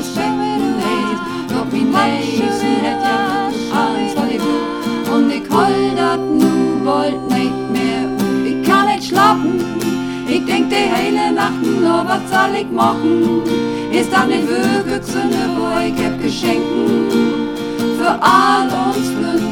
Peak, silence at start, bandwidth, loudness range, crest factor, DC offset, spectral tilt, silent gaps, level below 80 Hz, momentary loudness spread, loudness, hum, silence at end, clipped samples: 0 dBFS; 0 s; 18.5 kHz; 2 LU; 14 dB; under 0.1%; -5 dB/octave; none; -46 dBFS; 5 LU; -16 LUFS; none; 0 s; under 0.1%